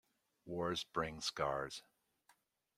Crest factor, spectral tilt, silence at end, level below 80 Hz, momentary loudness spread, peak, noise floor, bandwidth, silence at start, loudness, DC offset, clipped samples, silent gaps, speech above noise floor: 22 dB; -3.5 dB/octave; 0.95 s; -68 dBFS; 9 LU; -22 dBFS; -75 dBFS; 16 kHz; 0.45 s; -41 LUFS; under 0.1%; under 0.1%; none; 34 dB